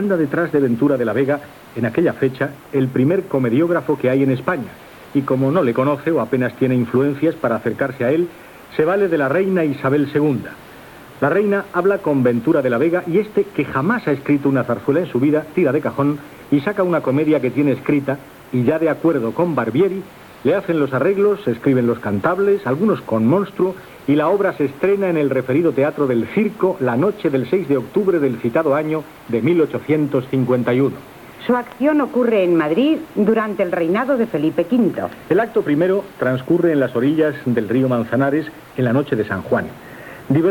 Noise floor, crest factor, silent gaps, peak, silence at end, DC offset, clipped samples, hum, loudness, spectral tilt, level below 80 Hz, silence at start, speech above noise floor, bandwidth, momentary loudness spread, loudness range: -39 dBFS; 14 dB; none; -4 dBFS; 0 s; under 0.1%; under 0.1%; none; -18 LUFS; -8.5 dB/octave; -56 dBFS; 0 s; 22 dB; 19 kHz; 5 LU; 1 LU